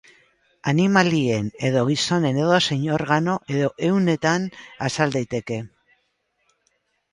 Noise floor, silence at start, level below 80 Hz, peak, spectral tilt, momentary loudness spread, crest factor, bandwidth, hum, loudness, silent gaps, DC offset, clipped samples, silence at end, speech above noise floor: -70 dBFS; 0.65 s; -58 dBFS; -2 dBFS; -5.5 dB/octave; 11 LU; 20 dB; 11 kHz; none; -21 LUFS; none; under 0.1%; under 0.1%; 1.45 s; 49 dB